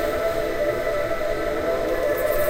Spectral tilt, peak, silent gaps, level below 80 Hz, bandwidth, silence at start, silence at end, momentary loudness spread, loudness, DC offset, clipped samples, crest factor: -4.5 dB/octave; -10 dBFS; none; -36 dBFS; 16 kHz; 0 s; 0 s; 2 LU; -24 LUFS; under 0.1%; under 0.1%; 14 dB